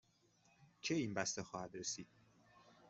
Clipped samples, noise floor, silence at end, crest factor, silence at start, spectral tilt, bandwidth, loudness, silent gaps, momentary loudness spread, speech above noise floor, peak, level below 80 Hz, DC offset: under 0.1%; -74 dBFS; 0 s; 24 dB; 0.6 s; -3.5 dB/octave; 8.2 kHz; -43 LUFS; none; 9 LU; 31 dB; -22 dBFS; -80 dBFS; under 0.1%